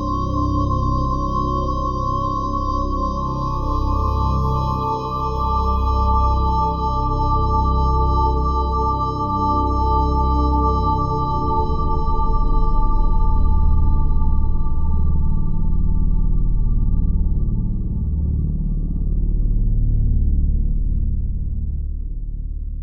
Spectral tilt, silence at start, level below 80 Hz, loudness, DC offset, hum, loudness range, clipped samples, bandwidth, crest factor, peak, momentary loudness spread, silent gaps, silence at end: -9.5 dB/octave; 0 s; -20 dBFS; -21 LUFS; under 0.1%; none; 4 LU; under 0.1%; 6.4 kHz; 12 dB; -4 dBFS; 6 LU; none; 0 s